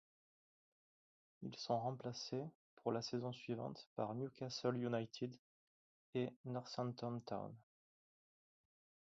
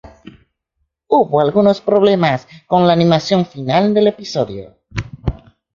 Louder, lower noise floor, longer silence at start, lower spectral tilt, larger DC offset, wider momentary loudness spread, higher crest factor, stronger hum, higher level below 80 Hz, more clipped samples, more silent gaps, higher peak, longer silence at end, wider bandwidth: second, -46 LUFS vs -15 LUFS; first, under -90 dBFS vs -70 dBFS; first, 1.4 s vs 0.05 s; second, -5.5 dB/octave vs -7 dB/octave; neither; second, 8 LU vs 13 LU; first, 22 dB vs 14 dB; neither; second, -84 dBFS vs -38 dBFS; neither; first, 2.55-2.77 s, 3.87-3.96 s, 5.39-6.13 s, 6.36-6.44 s vs none; second, -26 dBFS vs 0 dBFS; first, 1.4 s vs 0.4 s; about the same, 7.6 kHz vs 7.4 kHz